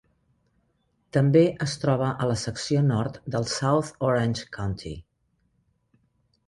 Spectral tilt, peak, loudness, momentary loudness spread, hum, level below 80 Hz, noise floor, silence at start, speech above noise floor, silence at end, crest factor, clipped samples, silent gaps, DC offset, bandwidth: -6 dB/octave; -8 dBFS; -25 LUFS; 11 LU; none; -52 dBFS; -71 dBFS; 1.15 s; 47 dB; 1.45 s; 20 dB; under 0.1%; none; under 0.1%; 11.5 kHz